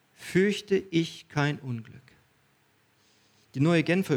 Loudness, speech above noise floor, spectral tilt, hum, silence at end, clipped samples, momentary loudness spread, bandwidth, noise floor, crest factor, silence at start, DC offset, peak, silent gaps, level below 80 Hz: -27 LUFS; 40 dB; -6.5 dB/octave; none; 0 s; under 0.1%; 13 LU; 16.5 kHz; -66 dBFS; 18 dB; 0.2 s; under 0.1%; -10 dBFS; none; -68 dBFS